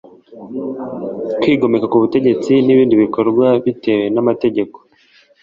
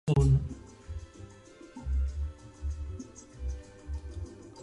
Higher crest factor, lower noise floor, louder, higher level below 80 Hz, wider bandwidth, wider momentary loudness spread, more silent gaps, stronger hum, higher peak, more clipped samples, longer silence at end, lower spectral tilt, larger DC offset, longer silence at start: second, 14 dB vs 20 dB; about the same, -51 dBFS vs -52 dBFS; first, -15 LUFS vs -34 LUFS; second, -56 dBFS vs -38 dBFS; second, 7.4 kHz vs 11 kHz; second, 14 LU vs 22 LU; neither; neither; first, -2 dBFS vs -14 dBFS; neither; first, 0.65 s vs 0 s; about the same, -8 dB/octave vs -8 dB/octave; neither; first, 0.3 s vs 0.05 s